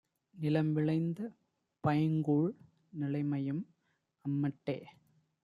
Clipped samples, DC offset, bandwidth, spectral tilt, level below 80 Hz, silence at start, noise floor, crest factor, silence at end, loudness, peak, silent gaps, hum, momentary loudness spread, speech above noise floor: under 0.1%; under 0.1%; 5.2 kHz; -10 dB/octave; -76 dBFS; 0.35 s; -79 dBFS; 16 dB; 0.55 s; -35 LUFS; -18 dBFS; none; none; 13 LU; 46 dB